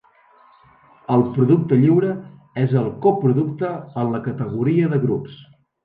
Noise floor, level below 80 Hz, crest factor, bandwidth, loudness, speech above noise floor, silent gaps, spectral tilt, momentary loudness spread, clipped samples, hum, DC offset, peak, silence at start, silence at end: -53 dBFS; -58 dBFS; 16 dB; 4.4 kHz; -19 LUFS; 35 dB; none; -11.5 dB/octave; 11 LU; under 0.1%; none; under 0.1%; -4 dBFS; 1.1 s; 0.4 s